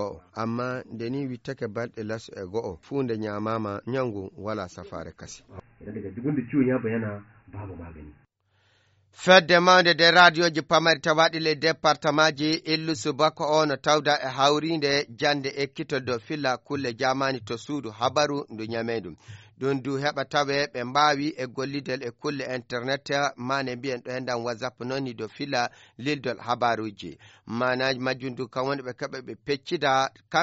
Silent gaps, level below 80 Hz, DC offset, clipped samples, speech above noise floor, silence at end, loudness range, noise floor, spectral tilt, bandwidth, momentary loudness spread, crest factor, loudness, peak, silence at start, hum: none; -62 dBFS; under 0.1%; under 0.1%; 42 dB; 0 s; 12 LU; -67 dBFS; -2.5 dB/octave; 8 kHz; 14 LU; 24 dB; -25 LUFS; -2 dBFS; 0 s; none